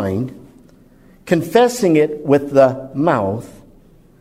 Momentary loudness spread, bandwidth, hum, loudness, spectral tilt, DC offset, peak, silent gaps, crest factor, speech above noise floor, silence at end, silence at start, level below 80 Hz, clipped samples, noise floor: 10 LU; 16 kHz; none; -16 LUFS; -6.5 dB/octave; under 0.1%; 0 dBFS; none; 16 dB; 32 dB; 0.7 s; 0 s; -52 dBFS; under 0.1%; -47 dBFS